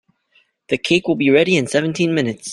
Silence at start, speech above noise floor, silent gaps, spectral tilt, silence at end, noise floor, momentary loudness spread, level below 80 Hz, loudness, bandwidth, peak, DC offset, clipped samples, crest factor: 0.7 s; 43 dB; none; -5 dB/octave; 0 s; -60 dBFS; 7 LU; -58 dBFS; -17 LUFS; 12 kHz; -2 dBFS; under 0.1%; under 0.1%; 16 dB